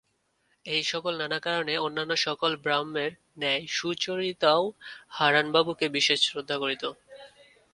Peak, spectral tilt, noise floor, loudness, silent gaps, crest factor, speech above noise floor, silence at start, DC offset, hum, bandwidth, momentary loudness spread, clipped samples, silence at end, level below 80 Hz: -6 dBFS; -3 dB/octave; -72 dBFS; -27 LUFS; none; 22 dB; 44 dB; 0.65 s; under 0.1%; none; 11.5 kHz; 10 LU; under 0.1%; 0.45 s; -72 dBFS